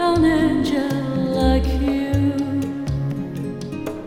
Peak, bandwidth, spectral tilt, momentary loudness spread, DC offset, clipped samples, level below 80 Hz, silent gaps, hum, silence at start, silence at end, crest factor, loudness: -6 dBFS; 15.5 kHz; -7 dB/octave; 11 LU; under 0.1%; under 0.1%; -30 dBFS; none; none; 0 s; 0 s; 14 dB; -21 LUFS